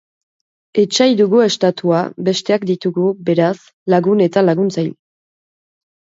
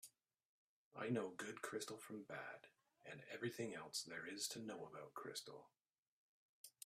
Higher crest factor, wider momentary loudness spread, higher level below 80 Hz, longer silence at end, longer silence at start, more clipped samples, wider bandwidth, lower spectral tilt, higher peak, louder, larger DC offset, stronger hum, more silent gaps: second, 16 dB vs 22 dB; second, 6 LU vs 17 LU; first, -64 dBFS vs under -90 dBFS; first, 1.2 s vs 0.15 s; first, 0.75 s vs 0.05 s; neither; second, 7.8 kHz vs 15.5 kHz; first, -5.5 dB/octave vs -3.5 dB/octave; first, 0 dBFS vs -30 dBFS; first, -15 LUFS vs -50 LUFS; neither; neither; second, 3.73-3.86 s vs 0.45-0.91 s, 5.98-6.64 s